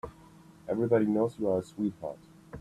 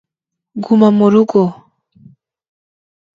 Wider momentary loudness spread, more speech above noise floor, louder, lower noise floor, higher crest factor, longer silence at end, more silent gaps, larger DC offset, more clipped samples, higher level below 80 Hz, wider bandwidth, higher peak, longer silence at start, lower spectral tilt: first, 23 LU vs 16 LU; second, 26 dB vs 70 dB; second, -30 LUFS vs -12 LUFS; second, -55 dBFS vs -81 dBFS; about the same, 20 dB vs 16 dB; second, 0 s vs 1.6 s; neither; neither; neither; about the same, -62 dBFS vs -60 dBFS; first, 13 kHz vs 7.2 kHz; second, -12 dBFS vs 0 dBFS; second, 0.05 s vs 0.55 s; about the same, -8.5 dB/octave vs -9 dB/octave